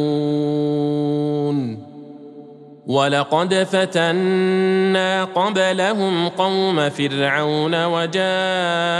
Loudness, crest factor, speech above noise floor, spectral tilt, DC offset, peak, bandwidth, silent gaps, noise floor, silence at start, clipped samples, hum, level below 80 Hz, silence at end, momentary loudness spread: -19 LUFS; 16 dB; 22 dB; -5.5 dB/octave; under 0.1%; -4 dBFS; 11.5 kHz; none; -40 dBFS; 0 s; under 0.1%; none; -72 dBFS; 0 s; 5 LU